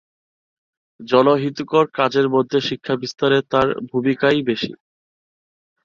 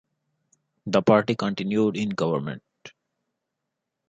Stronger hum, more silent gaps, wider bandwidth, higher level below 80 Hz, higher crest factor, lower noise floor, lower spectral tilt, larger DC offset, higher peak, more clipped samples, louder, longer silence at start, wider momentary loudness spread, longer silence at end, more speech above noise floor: neither; neither; about the same, 7.2 kHz vs 7.8 kHz; first, -58 dBFS vs -64 dBFS; about the same, 18 dB vs 22 dB; first, under -90 dBFS vs -83 dBFS; about the same, -6 dB/octave vs -6.5 dB/octave; neither; about the same, -2 dBFS vs -4 dBFS; neither; first, -19 LUFS vs -23 LUFS; first, 1 s vs 0.85 s; second, 7 LU vs 16 LU; about the same, 1.1 s vs 1.2 s; first, over 72 dB vs 60 dB